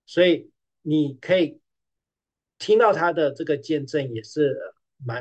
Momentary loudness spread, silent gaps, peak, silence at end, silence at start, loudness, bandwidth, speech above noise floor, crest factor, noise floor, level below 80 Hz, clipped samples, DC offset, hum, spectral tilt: 15 LU; none; -6 dBFS; 0 s; 0.1 s; -23 LUFS; 8.8 kHz; 68 dB; 18 dB; -89 dBFS; -74 dBFS; under 0.1%; under 0.1%; none; -6.5 dB/octave